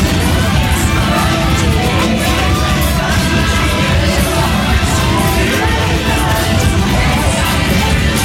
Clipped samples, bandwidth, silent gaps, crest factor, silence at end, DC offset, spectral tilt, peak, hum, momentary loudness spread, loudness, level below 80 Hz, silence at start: under 0.1%; 17 kHz; none; 10 dB; 0 s; under 0.1%; -4.5 dB/octave; -2 dBFS; none; 1 LU; -13 LUFS; -18 dBFS; 0 s